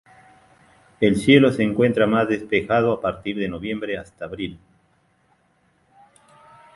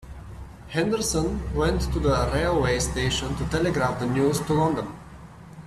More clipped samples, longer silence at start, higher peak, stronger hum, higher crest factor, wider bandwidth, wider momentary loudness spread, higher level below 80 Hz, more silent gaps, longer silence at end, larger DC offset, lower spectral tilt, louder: neither; first, 1 s vs 0 s; first, 0 dBFS vs -10 dBFS; neither; first, 22 dB vs 16 dB; second, 11.5 kHz vs 14 kHz; second, 16 LU vs 19 LU; second, -52 dBFS vs -34 dBFS; neither; first, 2.2 s vs 0 s; neither; first, -6.5 dB/octave vs -5 dB/octave; first, -20 LUFS vs -24 LUFS